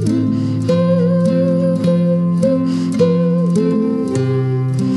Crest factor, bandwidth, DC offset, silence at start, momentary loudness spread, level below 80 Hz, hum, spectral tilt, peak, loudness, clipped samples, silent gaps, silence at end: 12 dB; 11 kHz; under 0.1%; 0 s; 3 LU; -52 dBFS; none; -8.5 dB/octave; -2 dBFS; -15 LUFS; under 0.1%; none; 0 s